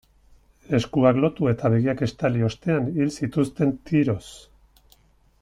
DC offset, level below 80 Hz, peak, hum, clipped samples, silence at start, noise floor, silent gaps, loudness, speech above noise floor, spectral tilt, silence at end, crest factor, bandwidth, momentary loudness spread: under 0.1%; -52 dBFS; -6 dBFS; none; under 0.1%; 0.7 s; -58 dBFS; none; -23 LUFS; 36 dB; -7.5 dB/octave; 1.05 s; 18 dB; 11.5 kHz; 6 LU